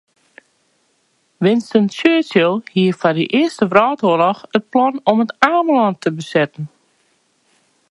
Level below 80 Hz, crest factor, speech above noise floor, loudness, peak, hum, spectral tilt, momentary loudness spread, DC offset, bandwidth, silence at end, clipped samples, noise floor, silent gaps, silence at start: -64 dBFS; 16 dB; 47 dB; -16 LUFS; 0 dBFS; none; -6.5 dB/octave; 5 LU; under 0.1%; 11.5 kHz; 1.25 s; under 0.1%; -62 dBFS; none; 1.4 s